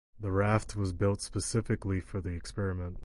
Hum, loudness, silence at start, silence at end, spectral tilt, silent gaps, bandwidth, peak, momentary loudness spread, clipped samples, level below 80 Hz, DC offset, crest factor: none; -33 LUFS; 0.15 s; 0 s; -6 dB/octave; none; 11.5 kHz; -14 dBFS; 8 LU; under 0.1%; -44 dBFS; under 0.1%; 18 dB